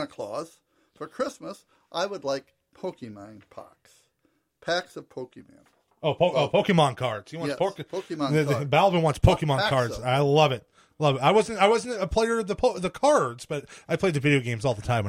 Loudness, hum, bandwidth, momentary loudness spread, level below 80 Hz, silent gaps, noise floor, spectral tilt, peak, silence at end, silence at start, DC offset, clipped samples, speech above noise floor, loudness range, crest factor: -25 LUFS; none; 15 kHz; 19 LU; -44 dBFS; none; -71 dBFS; -5.5 dB/octave; -6 dBFS; 0 s; 0 s; under 0.1%; under 0.1%; 46 dB; 13 LU; 20 dB